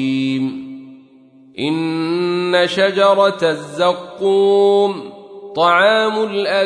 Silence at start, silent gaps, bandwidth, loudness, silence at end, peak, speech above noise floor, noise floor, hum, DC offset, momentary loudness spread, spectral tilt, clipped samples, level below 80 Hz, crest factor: 0 s; none; 10.5 kHz; -16 LUFS; 0 s; -2 dBFS; 31 dB; -46 dBFS; none; under 0.1%; 17 LU; -5 dB/octave; under 0.1%; -68 dBFS; 14 dB